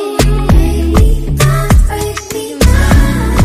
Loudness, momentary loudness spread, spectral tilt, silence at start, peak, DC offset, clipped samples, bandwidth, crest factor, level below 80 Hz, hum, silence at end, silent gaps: -11 LUFS; 9 LU; -5.5 dB/octave; 0 s; 0 dBFS; under 0.1%; under 0.1%; 15.5 kHz; 8 dB; -12 dBFS; none; 0 s; none